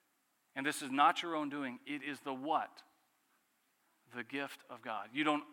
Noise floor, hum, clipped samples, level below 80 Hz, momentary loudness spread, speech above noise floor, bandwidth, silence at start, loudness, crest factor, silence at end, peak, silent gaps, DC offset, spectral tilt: -78 dBFS; none; under 0.1%; under -90 dBFS; 17 LU; 41 dB; 17.5 kHz; 0.55 s; -37 LUFS; 24 dB; 0 s; -16 dBFS; none; under 0.1%; -3.5 dB/octave